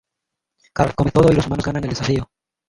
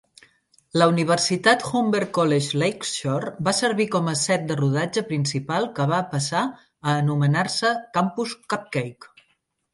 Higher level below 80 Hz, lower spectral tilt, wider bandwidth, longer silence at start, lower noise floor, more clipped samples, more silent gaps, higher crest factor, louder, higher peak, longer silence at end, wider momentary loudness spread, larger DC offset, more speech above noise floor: first, -38 dBFS vs -66 dBFS; first, -7 dB/octave vs -4.5 dB/octave; about the same, 11.5 kHz vs 11.5 kHz; about the same, 0.75 s vs 0.75 s; first, -82 dBFS vs -69 dBFS; neither; neither; about the same, 18 dB vs 20 dB; first, -19 LUFS vs -22 LUFS; about the same, 0 dBFS vs -2 dBFS; second, 0.45 s vs 0.7 s; about the same, 10 LU vs 8 LU; neither; first, 64 dB vs 47 dB